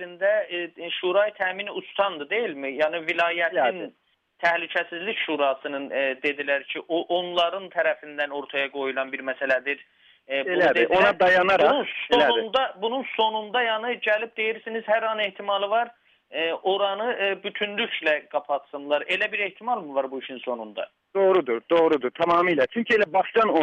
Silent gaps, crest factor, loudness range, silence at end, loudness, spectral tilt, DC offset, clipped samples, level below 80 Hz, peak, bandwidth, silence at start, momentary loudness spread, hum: none; 18 dB; 5 LU; 0 s; -24 LUFS; -5 dB/octave; under 0.1%; under 0.1%; -68 dBFS; -6 dBFS; 8.4 kHz; 0 s; 10 LU; none